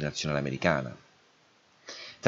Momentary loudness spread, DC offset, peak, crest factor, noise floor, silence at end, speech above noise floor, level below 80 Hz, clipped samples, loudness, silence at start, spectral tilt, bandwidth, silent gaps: 21 LU; under 0.1%; -6 dBFS; 26 dB; -64 dBFS; 0 s; 34 dB; -58 dBFS; under 0.1%; -30 LUFS; 0 s; -5 dB/octave; 8 kHz; none